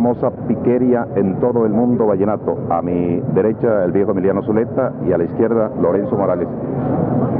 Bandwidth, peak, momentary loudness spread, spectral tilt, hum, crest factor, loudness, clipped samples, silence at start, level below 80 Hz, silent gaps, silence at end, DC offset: 3.5 kHz; -4 dBFS; 4 LU; -13.5 dB/octave; none; 12 dB; -17 LUFS; under 0.1%; 0 s; -46 dBFS; none; 0 s; under 0.1%